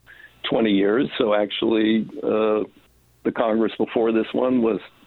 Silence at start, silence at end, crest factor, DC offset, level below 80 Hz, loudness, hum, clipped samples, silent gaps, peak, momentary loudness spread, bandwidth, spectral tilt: 0.25 s; 0.2 s; 18 dB; under 0.1%; -60 dBFS; -21 LUFS; none; under 0.1%; none; -4 dBFS; 6 LU; 4.3 kHz; -8 dB/octave